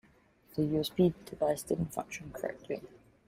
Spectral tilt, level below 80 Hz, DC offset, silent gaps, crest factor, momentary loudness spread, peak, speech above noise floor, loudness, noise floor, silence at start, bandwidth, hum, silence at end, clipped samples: -6 dB/octave; -60 dBFS; under 0.1%; none; 20 dB; 12 LU; -16 dBFS; 31 dB; -34 LUFS; -64 dBFS; 0.55 s; 16 kHz; none; 0.4 s; under 0.1%